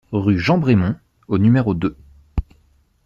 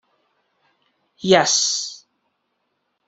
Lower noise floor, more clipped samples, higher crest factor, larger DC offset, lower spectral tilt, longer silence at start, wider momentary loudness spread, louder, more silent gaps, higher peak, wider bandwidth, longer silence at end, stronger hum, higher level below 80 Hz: second, -57 dBFS vs -73 dBFS; neither; second, 14 dB vs 22 dB; neither; first, -8.5 dB/octave vs -2 dB/octave; second, 0.1 s vs 1.25 s; about the same, 13 LU vs 15 LU; about the same, -19 LUFS vs -17 LUFS; neither; second, -4 dBFS vs 0 dBFS; second, 7.2 kHz vs 8.4 kHz; second, 0.65 s vs 1.1 s; neither; first, -34 dBFS vs -70 dBFS